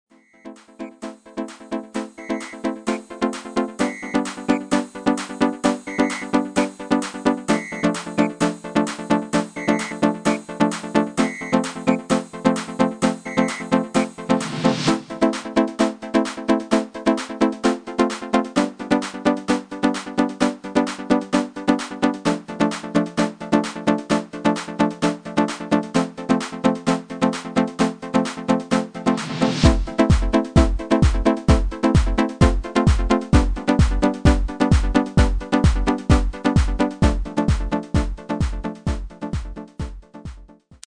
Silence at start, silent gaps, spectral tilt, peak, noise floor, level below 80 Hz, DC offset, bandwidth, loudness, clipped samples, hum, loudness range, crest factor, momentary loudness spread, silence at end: 0.45 s; none; -6 dB/octave; 0 dBFS; -45 dBFS; -28 dBFS; under 0.1%; 10 kHz; -21 LUFS; under 0.1%; none; 5 LU; 20 dB; 8 LU; 0.4 s